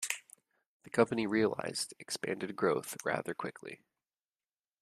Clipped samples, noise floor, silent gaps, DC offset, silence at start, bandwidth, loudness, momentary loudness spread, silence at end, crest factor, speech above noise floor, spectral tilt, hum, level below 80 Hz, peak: under 0.1%; under -90 dBFS; 0.66-0.80 s; under 0.1%; 0 s; 15 kHz; -35 LUFS; 12 LU; 1.05 s; 26 dB; over 56 dB; -4 dB/octave; none; -76 dBFS; -10 dBFS